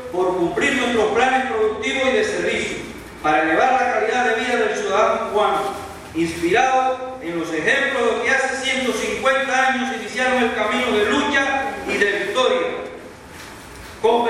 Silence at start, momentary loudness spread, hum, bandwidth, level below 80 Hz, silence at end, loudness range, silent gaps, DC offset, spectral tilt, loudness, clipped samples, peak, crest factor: 0 s; 11 LU; none; 14.5 kHz; -50 dBFS; 0 s; 1 LU; none; under 0.1%; -3.5 dB/octave; -19 LUFS; under 0.1%; -4 dBFS; 16 dB